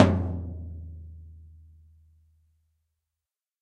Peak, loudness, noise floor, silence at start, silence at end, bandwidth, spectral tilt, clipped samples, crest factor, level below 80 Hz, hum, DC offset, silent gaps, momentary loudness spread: 0 dBFS; -30 LUFS; under -90 dBFS; 0 s; 2.15 s; 8.6 kHz; -8 dB/octave; under 0.1%; 30 dB; -46 dBFS; none; under 0.1%; none; 24 LU